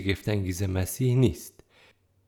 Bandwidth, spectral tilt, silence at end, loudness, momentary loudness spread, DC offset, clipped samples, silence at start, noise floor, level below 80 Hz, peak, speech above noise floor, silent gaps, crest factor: 19.5 kHz; -6 dB/octave; 0.8 s; -27 LUFS; 13 LU; under 0.1%; under 0.1%; 0 s; -61 dBFS; -52 dBFS; -10 dBFS; 35 dB; none; 18 dB